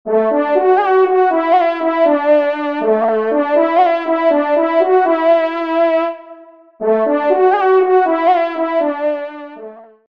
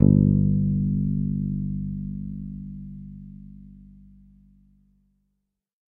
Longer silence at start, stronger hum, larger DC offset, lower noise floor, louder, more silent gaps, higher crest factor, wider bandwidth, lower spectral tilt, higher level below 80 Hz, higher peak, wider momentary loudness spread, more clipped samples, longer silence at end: about the same, 0.05 s vs 0 s; second, none vs 50 Hz at -60 dBFS; first, 0.3% vs under 0.1%; second, -39 dBFS vs -77 dBFS; first, -14 LUFS vs -25 LUFS; neither; second, 12 dB vs 24 dB; first, 5.6 kHz vs 1 kHz; second, -7 dB/octave vs -15.5 dB/octave; second, -68 dBFS vs -40 dBFS; about the same, -2 dBFS vs -2 dBFS; second, 7 LU vs 23 LU; neither; second, 0.3 s vs 2.15 s